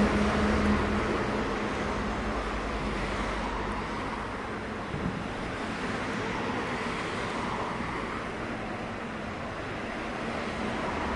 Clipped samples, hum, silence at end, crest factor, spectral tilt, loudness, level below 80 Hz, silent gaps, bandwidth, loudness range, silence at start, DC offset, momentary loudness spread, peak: under 0.1%; none; 0 s; 16 dB; -5.5 dB/octave; -31 LUFS; -42 dBFS; none; 11.5 kHz; 4 LU; 0 s; under 0.1%; 9 LU; -14 dBFS